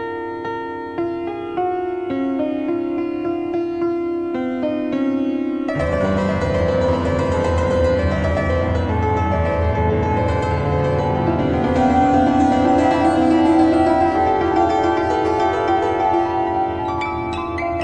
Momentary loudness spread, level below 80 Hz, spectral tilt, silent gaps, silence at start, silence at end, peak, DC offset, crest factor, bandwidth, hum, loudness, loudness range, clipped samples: 8 LU; -34 dBFS; -7.5 dB/octave; none; 0 s; 0 s; -4 dBFS; under 0.1%; 14 dB; 9.2 kHz; none; -19 LUFS; 7 LU; under 0.1%